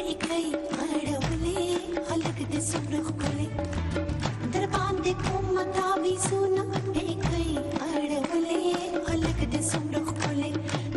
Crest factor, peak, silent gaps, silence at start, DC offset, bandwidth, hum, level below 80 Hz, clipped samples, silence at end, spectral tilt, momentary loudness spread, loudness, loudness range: 16 dB; -12 dBFS; none; 0 s; under 0.1%; 12 kHz; none; -42 dBFS; under 0.1%; 0 s; -5 dB/octave; 4 LU; -29 LUFS; 2 LU